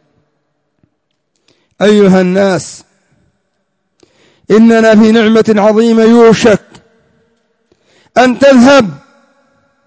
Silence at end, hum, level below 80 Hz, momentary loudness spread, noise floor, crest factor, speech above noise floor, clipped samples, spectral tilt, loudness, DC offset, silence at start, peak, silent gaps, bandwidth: 0.9 s; none; -48 dBFS; 8 LU; -65 dBFS; 10 dB; 59 dB; 2%; -6 dB/octave; -7 LUFS; under 0.1%; 1.8 s; 0 dBFS; none; 8 kHz